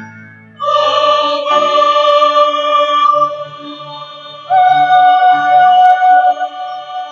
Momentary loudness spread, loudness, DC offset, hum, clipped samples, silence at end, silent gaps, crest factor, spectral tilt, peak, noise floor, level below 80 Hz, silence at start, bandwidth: 19 LU; -10 LUFS; under 0.1%; none; under 0.1%; 0 s; none; 10 dB; -3 dB/octave; 0 dBFS; -36 dBFS; -68 dBFS; 0 s; 7.4 kHz